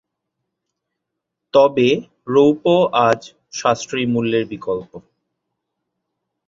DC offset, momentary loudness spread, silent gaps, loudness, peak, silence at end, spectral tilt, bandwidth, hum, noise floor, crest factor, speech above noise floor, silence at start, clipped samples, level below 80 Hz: under 0.1%; 10 LU; none; -17 LUFS; -2 dBFS; 1.5 s; -5.5 dB/octave; 7.8 kHz; none; -80 dBFS; 18 dB; 63 dB; 1.55 s; under 0.1%; -60 dBFS